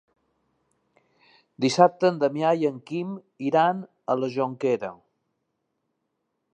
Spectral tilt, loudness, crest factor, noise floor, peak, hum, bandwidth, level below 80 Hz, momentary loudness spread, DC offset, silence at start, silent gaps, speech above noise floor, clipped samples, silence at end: -6 dB/octave; -24 LUFS; 24 dB; -78 dBFS; -2 dBFS; none; 9.4 kHz; -78 dBFS; 12 LU; under 0.1%; 1.6 s; none; 54 dB; under 0.1%; 1.6 s